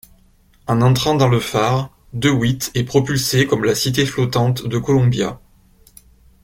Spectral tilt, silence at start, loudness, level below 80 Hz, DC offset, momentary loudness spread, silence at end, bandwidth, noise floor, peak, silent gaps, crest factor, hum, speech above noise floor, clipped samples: -5.5 dB/octave; 0.65 s; -17 LUFS; -44 dBFS; under 0.1%; 7 LU; 1.05 s; 16.5 kHz; -53 dBFS; -2 dBFS; none; 16 dB; none; 36 dB; under 0.1%